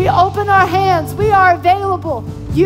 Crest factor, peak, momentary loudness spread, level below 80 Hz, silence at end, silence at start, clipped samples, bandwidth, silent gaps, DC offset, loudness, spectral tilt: 12 dB; -2 dBFS; 10 LU; -34 dBFS; 0 s; 0 s; under 0.1%; 16 kHz; none; under 0.1%; -13 LUFS; -6.5 dB/octave